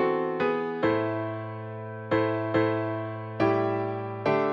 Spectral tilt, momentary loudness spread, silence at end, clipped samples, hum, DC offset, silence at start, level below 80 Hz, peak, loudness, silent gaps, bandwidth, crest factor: -8.5 dB/octave; 10 LU; 0 s; under 0.1%; none; under 0.1%; 0 s; -64 dBFS; -12 dBFS; -28 LUFS; none; 6.6 kHz; 16 dB